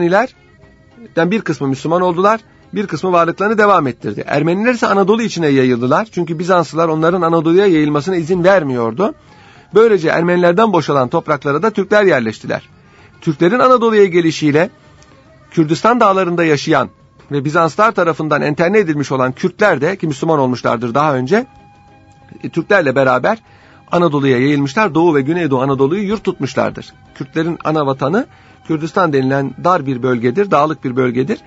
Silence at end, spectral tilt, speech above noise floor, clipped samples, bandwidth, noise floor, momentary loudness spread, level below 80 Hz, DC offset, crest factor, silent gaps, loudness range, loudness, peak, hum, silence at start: 0.1 s; -6.5 dB/octave; 31 dB; under 0.1%; 8 kHz; -45 dBFS; 9 LU; -54 dBFS; under 0.1%; 14 dB; none; 3 LU; -14 LUFS; 0 dBFS; none; 0 s